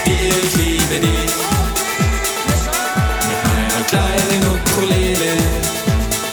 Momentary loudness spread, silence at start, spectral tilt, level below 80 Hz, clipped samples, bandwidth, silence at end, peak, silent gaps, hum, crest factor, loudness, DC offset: 3 LU; 0 s; -4 dB/octave; -24 dBFS; under 0.1%; over 20 kHz; 0 s; 0 dBFS; none; none; 16 dB; -16 LUFS; under 0.1%